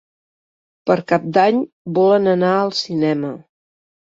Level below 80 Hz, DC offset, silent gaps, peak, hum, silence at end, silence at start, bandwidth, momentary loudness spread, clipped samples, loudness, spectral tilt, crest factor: -62 dBFS; under 0.1%; 1.73-1.85 s; -2 dBFS; none; 0.75 s; 0.85 s; 7.8 kHz; 10 LU; under 0.1%; -17 LUFS; -6.5 dB/octave; 16 dB